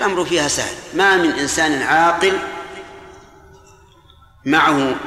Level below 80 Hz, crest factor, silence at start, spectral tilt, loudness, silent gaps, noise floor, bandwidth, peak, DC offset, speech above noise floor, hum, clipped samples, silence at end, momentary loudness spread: -48 dBFS; 16 dB; 0 s; -3 dB/octave; -16 LUFS; none; -48 dBFS; 15 kHz; -4 dBFS; under 0.1%; 32 dB; none; under 0.1%; 0 s; 17 LU